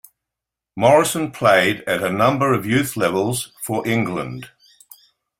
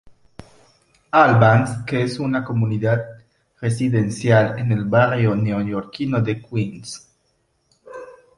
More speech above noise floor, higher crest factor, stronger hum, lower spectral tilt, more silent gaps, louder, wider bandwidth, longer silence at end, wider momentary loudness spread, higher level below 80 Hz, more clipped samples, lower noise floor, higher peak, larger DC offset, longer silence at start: first, 67 dB vs 48 dB; about the same, 18 dB vs 18 dB; neither; second, -4.5 dB/octave vs -7 dB/octave; neither; about the same, -18 LUFS vs -19 LUFS; first, 16.5 kHz vs 11.5 kHz; first, 0.9 s vs 0.25 s; second, 11 LU vs 20 LU; about the same, -56 dBFS vs -52 dBFS; neither; first, -85 dBFS vs -66 dBFS; about the same, -2 dBFS vs -2 dBFS; neither; first, 0.75 s vs 0.05 s